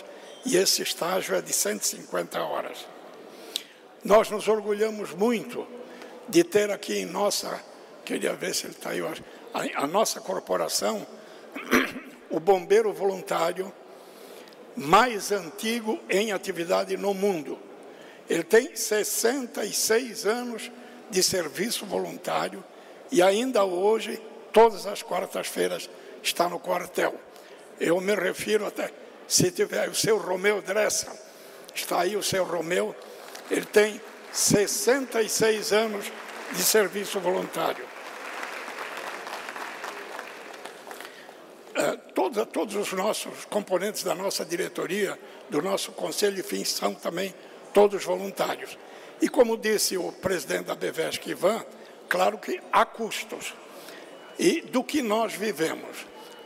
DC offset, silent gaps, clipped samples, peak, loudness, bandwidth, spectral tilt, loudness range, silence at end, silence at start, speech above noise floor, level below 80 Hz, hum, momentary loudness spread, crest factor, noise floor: under 0.1%; none; under 0.1%; -8 dBFS; -26 LUFS; 16 kHz; -3 dB/octave; 5 LU; 0 s; 0 s; 21 dB; -66 dBFS; none; 19 LU; 18 dB; -47 dBFS